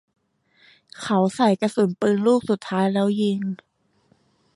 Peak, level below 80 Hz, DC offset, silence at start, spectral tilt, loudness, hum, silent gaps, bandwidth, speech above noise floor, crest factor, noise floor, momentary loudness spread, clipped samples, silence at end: -8 dBFS; -66 dBFS; under 0.1%; 1 s; -6.5 dB/octave; -21 LUFS; none; none; 11.5 kHz; 42 dB; 16 dB; -63 dBFS; 9 LU; under 0.1%; 1 s